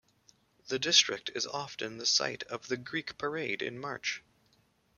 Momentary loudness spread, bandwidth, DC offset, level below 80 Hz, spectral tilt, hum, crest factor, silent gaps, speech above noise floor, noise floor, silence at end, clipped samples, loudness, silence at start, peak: 13 LU; 13 kHz; under 0.1%; -74 dBFS; -1 dB/octave; none; 26 dB; none; 37 dB; -70 dBFS; 0.8 s; under 0.1%; -31 LUFS; 0.65 s; -8 dBFS